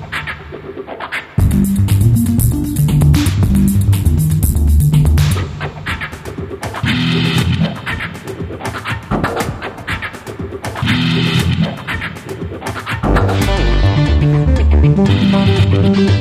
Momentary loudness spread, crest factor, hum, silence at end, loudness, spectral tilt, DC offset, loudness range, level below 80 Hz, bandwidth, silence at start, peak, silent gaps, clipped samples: 13 LU; 14 dB; none; 0 s; -15 LUFS; -6 dB/octave; under 0.1%; 6 LU; -20 dBFS; 15.5 kHz; 0 s; 0 dBFS; none; under 0.1%